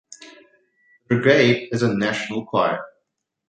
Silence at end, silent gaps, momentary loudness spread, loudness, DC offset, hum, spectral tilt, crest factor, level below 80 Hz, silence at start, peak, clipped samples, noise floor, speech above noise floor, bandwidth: 0.6 s; none; 9 LU; -20 LUFS; under 0.1%; none; -6 dB/octave; 20 dB; -60 dBFS; 0.2 s; -2 dBFS; under 0.1%; -76 dBFS; 57 dB; 9.2 kHz